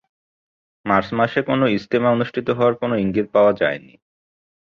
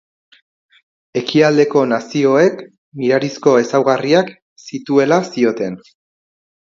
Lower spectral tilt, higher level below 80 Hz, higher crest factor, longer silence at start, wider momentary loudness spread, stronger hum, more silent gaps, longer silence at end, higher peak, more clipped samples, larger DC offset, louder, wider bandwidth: first, -8 dB/octave vs -5.5 dB/octave; first, -54 dBFS vs -64 dBFS; about the same, 18 dB vs 16 dB; second, 0.85 s vs 1.15 s; second, 6 LU vs 14 LU; neither; second, none vs 2.78-2.92 s, 4.42-4.56 s; about the same, 0.9 s vs 0.85 s; second, -4 dBFS vs 0 dBFS; neither; neither; second, -19 LUFS vs -15 LUFS; second, 6.8 kHz vs 7.6 kHz